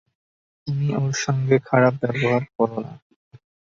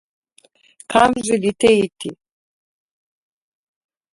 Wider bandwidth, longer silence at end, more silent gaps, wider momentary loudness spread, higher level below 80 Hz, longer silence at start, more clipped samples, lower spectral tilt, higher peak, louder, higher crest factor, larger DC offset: second, 7.6 kHz vs 11.5 kHz; second, 0.8 s vs 2 s; first, 2.55-2.59 s vs none; about the same, 13 LU vs 14 LU; second, -60 dBFS vs -54 dBFS; second, 0.65 s vs 0.9 s; neither; first, -6 dB/octave vs -4 dB/octave; second, -4 dBFS vs 0 dBFS; second, -21 LUFS vs -17 LUFS; about the same, 20 dB vs 22 dB; neither